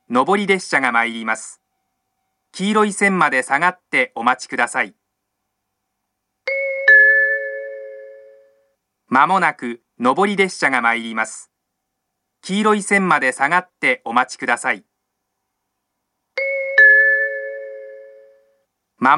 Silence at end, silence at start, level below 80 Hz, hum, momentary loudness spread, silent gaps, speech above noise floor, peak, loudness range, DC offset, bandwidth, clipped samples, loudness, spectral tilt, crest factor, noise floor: 0 s; 0.1 s; -78 dBFS; none; 19 LU; none; 58 dB; 0 dBFS; 4 LU; under 0.1%; 12 kHz; under 0.1%; -16 LUFS; -4 dB/octave; 18 dB; -76 dBFS